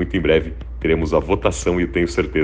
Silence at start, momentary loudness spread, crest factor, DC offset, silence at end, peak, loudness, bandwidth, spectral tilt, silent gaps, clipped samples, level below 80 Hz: 0 s; 3 LU; 18 dB; under 0.1%; 0 s; 0 dBFS; -19 LUFS; 9.8 kHz; -6 dB/octave; none; under 0.1%; -30 dBFS